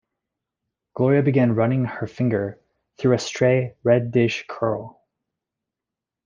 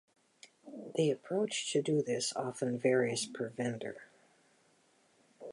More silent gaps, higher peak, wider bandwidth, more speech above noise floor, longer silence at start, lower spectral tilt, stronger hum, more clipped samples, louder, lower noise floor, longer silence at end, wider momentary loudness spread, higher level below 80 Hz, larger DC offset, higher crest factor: neither; first, -4 dBFS vs -16 dBFS; second, 7.6 kHz vs 11.5 kHz; first, 67 dB vs 36 dB; first, 0.95 s vs 0.65 s; first, -7 dB/octave vs -4.5 dB/octave; neither; neither; first, -21 LUFS vs -34 LUFS; first, -87 dBFS vs -70 dBFS; first, 1.35 s vs 0 s; second, 8 LU vs 16 LU; first, -60 dBFS vs -82 dBFS; neither; about the same, 18 dB vs 20 dB